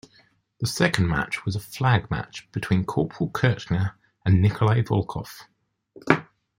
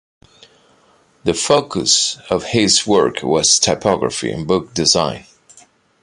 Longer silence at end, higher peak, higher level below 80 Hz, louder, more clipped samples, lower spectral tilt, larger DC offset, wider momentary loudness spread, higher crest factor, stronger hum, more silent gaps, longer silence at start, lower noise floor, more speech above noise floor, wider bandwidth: second, 0.35 s vs 0.8 s; about the same, -2 dBFS vs 0 dBFS; about the same, -48 dBFS vs -46 dBFS; second, -24 LUFS vs -15 LUFS; neither; first, -6 dB/octave vs -2.5 dB/octave; neither; first, 12 LU vs 9 LU; about the same, 22 dB vs 18 dB; neither; neither; second, 0.6 s vs 1.25 s; first, -60 dBFS vs -54 dBFS; about the same, 37 dB vs 38 dB; first, 16.5 kHz vs 11.5 kHz